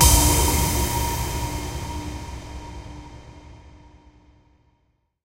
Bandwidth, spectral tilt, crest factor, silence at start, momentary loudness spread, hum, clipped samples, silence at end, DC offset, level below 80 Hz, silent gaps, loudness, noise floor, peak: 16 kHz; -3.5 dB/octave; 22 dB; 0 s; 24 LU; none; under 0.1%; 1.5 s; under 0.1%; -28 dBFS; none; -22 LUFS; -68 dBFS; -2 dBFS